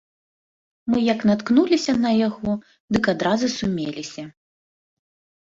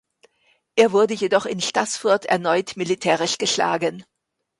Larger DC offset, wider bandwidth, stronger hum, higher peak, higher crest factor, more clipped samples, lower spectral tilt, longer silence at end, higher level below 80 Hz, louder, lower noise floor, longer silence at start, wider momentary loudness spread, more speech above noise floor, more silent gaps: neither; second, 7.8 kHz vs 11.5 kHz; neither; about the same, -6 dBFS vs -4 dBFS; about the same, 18 dB vs 18 dB; neither; first, -5.5 dB/octave vs -3 dB/octave; first, 1.15 s vs 0.55 s; first, -54 dBFS vs -66 dBFS; about the same, -21 LUFS vs -20 LUFS; first, under -90 dBFS vs -64 dBFS; about the same, 0.85 s vs 0.75 s; first, 15 LU vs 6 LU; first, over 69 dB vs 44 dB; first, 2.80-2.88 s vs none